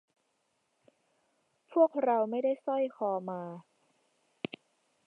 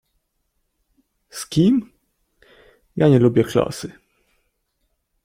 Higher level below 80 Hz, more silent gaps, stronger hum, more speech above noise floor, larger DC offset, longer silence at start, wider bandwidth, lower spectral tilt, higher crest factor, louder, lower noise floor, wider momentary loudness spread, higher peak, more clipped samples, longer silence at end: second, -88 dBFS vs -54 dBFS; neither; neither; second, 48 dB vs 55 dB; neither; first, 1.7 s vs 1.35 s; second, 4.7 kHz vs 16 kHz; about the same, -8 dB/octave vs -7 dB/octave; about the same, 20 dB vs 20 dB; second, -31 LUFS vs -18 LUFS; first, -78 dBFS vs -72 dBFS; second, 17 LU vs 20 LU; second, -14 dBFS vs -2 dBFS; neither; about the same, 1.45 s vs 1.35 s